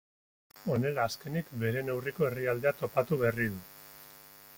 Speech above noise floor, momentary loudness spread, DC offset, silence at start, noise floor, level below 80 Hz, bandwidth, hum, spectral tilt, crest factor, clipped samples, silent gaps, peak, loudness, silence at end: 22 dB; 19 LU; under 0.1%; 0.55 s; -54 dBFS; -64 dBFS; 17 kHz; none; -6.5 dB/octave; 20 dB; under 0.1%; none; -14 dBFS; -32 LUFS; 0 s